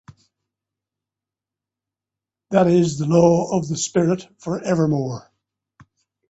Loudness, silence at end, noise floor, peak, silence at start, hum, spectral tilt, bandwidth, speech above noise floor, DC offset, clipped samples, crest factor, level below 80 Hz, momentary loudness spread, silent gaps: -19 LUFS; 1.1 s; -88 dBFS; -2 dBFS; 2.5 s; none; -6.5 dB/octave; 8.2 kHz; 70 dB; under 0.1%; under 0.1%; 20 dB; -60 dBFS; 11 LU; none